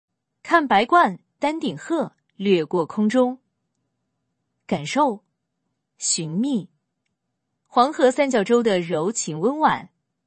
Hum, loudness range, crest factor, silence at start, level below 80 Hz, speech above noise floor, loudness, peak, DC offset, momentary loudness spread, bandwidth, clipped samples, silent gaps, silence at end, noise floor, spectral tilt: none; 5 LU; 20 dB; 0.45 s; -68 dBFS; 58 dB; -21 LUFS; -2 dBFS; under 0.1%; 10 LU; 8.8 kHz; under 0.1%; none; 0.4 s; -78 dBFS; -4 dB/octave